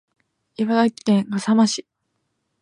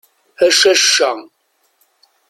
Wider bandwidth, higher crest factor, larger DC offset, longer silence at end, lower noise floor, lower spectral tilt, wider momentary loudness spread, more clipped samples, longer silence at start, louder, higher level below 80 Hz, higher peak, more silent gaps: second, 10.5 kHz vs 16 kHz; about the same, 16 dB vs 16 dB; neither; second, 0.8 s vs 1.1 s; first, -74 dBFS vs -61 dBFS; first, -5 dB/octave vs 1 dB/octave; about the same, 7 LU vs 9 LU; neither; first, 0.6 s vs 0.4 s; second, -20 LUFS vs -11 LUFS; about the same, -70 dBFS vs -66 dBFS; second, -6 dBFS vs 0 dBFS; neither